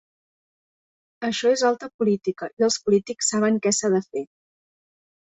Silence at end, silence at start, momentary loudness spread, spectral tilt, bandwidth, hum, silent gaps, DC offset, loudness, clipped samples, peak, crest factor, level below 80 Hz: 0.95 s; 1.2 s; 10 LU; -3.5 dB/octave; 8.2 kHz; none; 1.94-1.99 s, 2.53-2.57 s; under 0.1%; -23 LUFS; under 0.1%; -8 dBFS; 16 dB; -66 dBFS